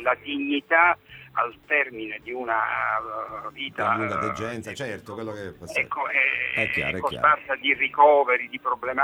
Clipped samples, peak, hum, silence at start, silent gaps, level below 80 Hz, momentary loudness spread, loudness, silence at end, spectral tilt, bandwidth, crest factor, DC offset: under 0.1%; -4 dBFS; none; 0 s; none; -60 dBFS; 14 LU; -23 LUFS; 0 s; -4.5 dB/octave; 16 kHz; 20 dB; under 0.1%